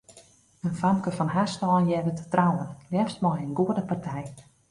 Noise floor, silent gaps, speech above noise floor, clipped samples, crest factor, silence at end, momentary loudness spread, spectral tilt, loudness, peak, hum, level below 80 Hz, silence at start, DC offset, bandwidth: -56 dBFS; none; 30 dB; under 0.1%; 20 dB; 0.3 s; 9 LU; -7.5 dB/octave; -27 LUFS; -8 dBFS; none; -60 dBFS; 0.1 s; under 0.1%; 11.5 kHz